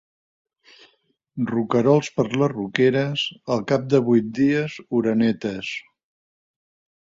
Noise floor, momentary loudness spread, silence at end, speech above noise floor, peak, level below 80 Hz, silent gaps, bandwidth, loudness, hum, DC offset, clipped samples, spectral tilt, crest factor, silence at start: -65 dBFS; 10 LU; 1.2 s; 45 dB; -2 dBFS; -60 dBFS; none; 7.8 kHz; -21 LUFS; none; under 0.1%; under 0.1%; -6.5 dB/octave; 20 dB; 1.35 s